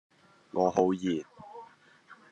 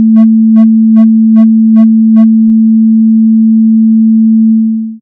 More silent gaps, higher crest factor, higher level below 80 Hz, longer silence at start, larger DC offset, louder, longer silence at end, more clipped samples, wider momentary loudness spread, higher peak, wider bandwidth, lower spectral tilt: neither; first, 22 dB vs 4 dB; second, -74 dBFS vs -60 dBFS; first, 0.55 s vs 0 s; neither; second, -29 LUFS vs -6 LUFS; first, 0.2 s vs 0.05 s; second, under 0.1% vs 3%; first, 22 LU vs 1 LU; second, -10 dBFS vs 0 dBFS; first, 8.4 kHz vs 2.1 kHz; second, -6.5 dB/octave vs -12 dB/octave